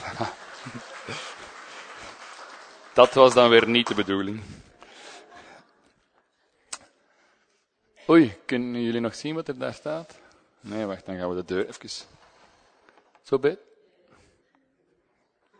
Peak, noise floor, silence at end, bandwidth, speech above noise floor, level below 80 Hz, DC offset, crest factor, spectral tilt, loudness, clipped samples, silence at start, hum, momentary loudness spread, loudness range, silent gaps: 0 dBFS; -70 dBFS; 2.05 s; 9.6 kHz; 48 dB; -66 dBFS; under 0.1%; 26 dB; -5 dB/octave; -23 LUFS; under 0.1%; 0 s; none; 25 LU; 13 LU; none